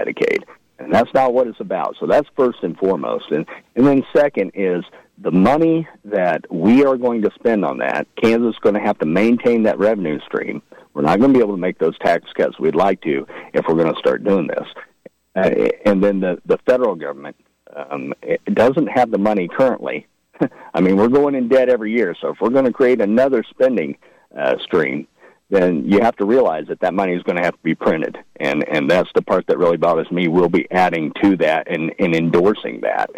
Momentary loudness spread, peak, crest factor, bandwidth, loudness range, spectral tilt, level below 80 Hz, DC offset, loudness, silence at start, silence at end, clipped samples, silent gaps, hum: 9 LU; -6 dBFS; 10 dB; 10.5 kHz; 3 LU; -7.5 dB/octave; -54 dBFS; under 0.1%; -17 LUFS; 0 s; 0 s; under 0.1%; none; none